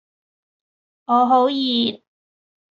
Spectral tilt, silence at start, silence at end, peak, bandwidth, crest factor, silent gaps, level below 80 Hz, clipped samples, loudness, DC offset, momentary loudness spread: -6 dB/octave; 1.1 s; 0.8 s; -6 dBFS; 7.2 kHz; 16 dB; none; -72 dBFS; under 0.1%; -18 LUFS; under 0.1%; 8 LU